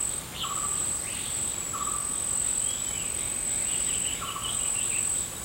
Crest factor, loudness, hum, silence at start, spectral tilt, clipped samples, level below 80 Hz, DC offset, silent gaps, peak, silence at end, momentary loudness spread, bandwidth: 14 dB; -27 LUFS; none; 0 s; -0.5 dB/octave; under 0.1%; -50 dBFS; under 0.1%; none; -16 dBFS; 0 s; 4 LU; 16 kHz